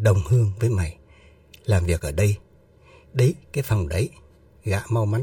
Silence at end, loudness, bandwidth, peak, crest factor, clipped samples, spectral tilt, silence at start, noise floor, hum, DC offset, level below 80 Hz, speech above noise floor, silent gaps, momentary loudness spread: 0 s; -23 LUFS; 17.5 kHz; -6 dBFS; 18 dB; under 0.1%; -6.5 dB/octave; 0 s; -53 dBFS; none; under 0.1%; -40 dBFS; 32 dB; none; 11 LU